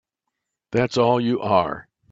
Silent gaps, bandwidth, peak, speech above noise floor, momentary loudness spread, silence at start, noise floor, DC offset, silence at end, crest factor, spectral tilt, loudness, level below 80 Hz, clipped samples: none; 7.8 kHz; -4 dBFS; 61 dB; 9 LU; 0.7 s; -81 dBFS; under 0.1%; 0.3 s; 18 dB; -6.5 dB/octave; -21 LUFS; -58 dBFS; under 0.1%